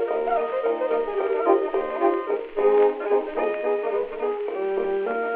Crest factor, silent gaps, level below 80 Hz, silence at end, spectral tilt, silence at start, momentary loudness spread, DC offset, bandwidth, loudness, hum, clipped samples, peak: 16 dB; none; -56 dBFS; 0 s; -8 dB/octave; 0 s; 6 LU; under 0.1%; 4.1 kHz; -24 LUFS; none; under 0.1%; -6 dBFS